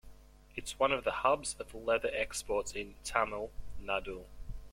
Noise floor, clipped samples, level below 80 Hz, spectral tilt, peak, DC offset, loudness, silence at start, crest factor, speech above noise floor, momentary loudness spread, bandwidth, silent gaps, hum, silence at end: -55 dBFS; under 0.1%; -52 dBFS; -2.5 dB/octave; -12 dBFS; under 0.1%; -34 LUFS; 0.05 s; 24 dB; 21 dB; 16 LU; 16.5 kHz; none; none; 0 s